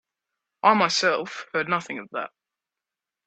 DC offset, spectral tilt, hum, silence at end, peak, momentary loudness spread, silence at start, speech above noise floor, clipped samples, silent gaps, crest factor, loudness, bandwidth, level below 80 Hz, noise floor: under 0.1%; -3 dB/octave; none; 1 s; -4 dBFS; 14 LU; 0.65 s; 64 dB; under 0.1%; none; 22 dB; -24 LUFS; 9 kHz; -74 dBFS; -88 dBFS